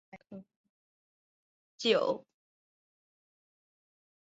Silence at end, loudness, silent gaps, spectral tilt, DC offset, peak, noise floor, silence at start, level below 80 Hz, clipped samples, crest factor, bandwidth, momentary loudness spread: 2.05 s; -31 LUFS; 0.56-1.78 s; -1.5 dB/octave; under 0.1%; -14 dBFS; under -90 dBFS; 0.15 s; -84 dBFS; under 0.1%; 26 dB; 7.6 kHz; 23 LU